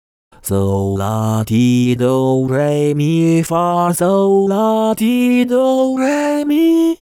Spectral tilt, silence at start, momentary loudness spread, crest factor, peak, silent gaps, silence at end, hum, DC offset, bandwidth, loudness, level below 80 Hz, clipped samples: -6.5 dB/octave; 0.45 s; 5 LU; 10 dB; -4 dBFS; none; 0.15 s; none; under 0.1%; 18 kHz; -14 LUFS; -52 dBFS; under 0.1%